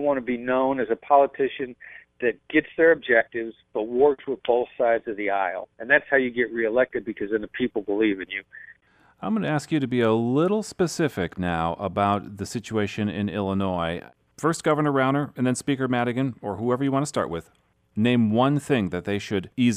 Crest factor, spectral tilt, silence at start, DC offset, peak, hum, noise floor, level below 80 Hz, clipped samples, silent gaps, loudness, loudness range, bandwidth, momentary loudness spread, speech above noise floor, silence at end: 20 dB; -6 dB/octave; 0 s; under 0.1%; -4 dBFS; none; -58 dBFS; -58 dBFS; under 0.1%; none; -24 LUFS; 4 LU; 14.5 kHz; 10 LU; 34 dB; 0 s